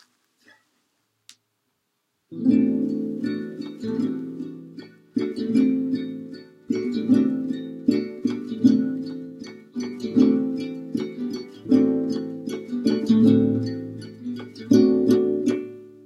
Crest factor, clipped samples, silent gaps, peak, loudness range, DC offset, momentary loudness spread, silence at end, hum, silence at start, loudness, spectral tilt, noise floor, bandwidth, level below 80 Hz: 18 dB; under 0.1%; none; -6 dBFS; 6 LU; under 0.1%; 17 LU; 0.05 s; none; 2.3 s; -23 LUFS; -7.5 dB/octave; -75 dBFS; 10.5 kHz; -66 dBFS